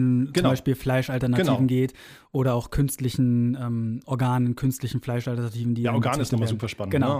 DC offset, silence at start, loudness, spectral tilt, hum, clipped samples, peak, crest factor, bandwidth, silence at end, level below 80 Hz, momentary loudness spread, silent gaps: under 0.1%; 0 s; -25 LUFS; -7 dB/octave; none; under 0.1%; -8 dBFS; 16 dB; 16 kHz; 0 s; -46 dBFS; 6 LU; none